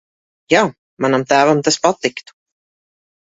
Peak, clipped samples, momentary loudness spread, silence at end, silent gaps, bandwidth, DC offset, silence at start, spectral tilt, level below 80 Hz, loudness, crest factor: 0 dBFS; under 0.1%; 9 LU; 1.05 s; 0.78-0.97 s; 8 kHz; under 0.1%; 0.5 s; -4 dB/octave; -58 dBFS; -16 LUFS; 18 dB